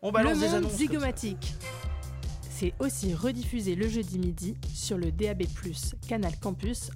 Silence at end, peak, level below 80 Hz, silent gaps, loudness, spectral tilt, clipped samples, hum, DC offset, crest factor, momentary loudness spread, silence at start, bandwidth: 0 s; -14 dBFS; -38 dBFS; none; -31 LUFS; -5 dB/octave; under 0.1%; none; under 0.1%; 16 dB; 10 LU; 0 s; 16.5 kHz